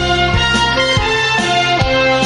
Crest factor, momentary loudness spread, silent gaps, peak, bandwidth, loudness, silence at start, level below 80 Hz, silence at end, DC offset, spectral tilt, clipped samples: 12 dB; 1 LU; none; -2 dBFS; 11 kHz; -13 LUFS; 0 s; -26 dBFS; 0 s; under 0.1%; -4 dB/octave; under 0.1%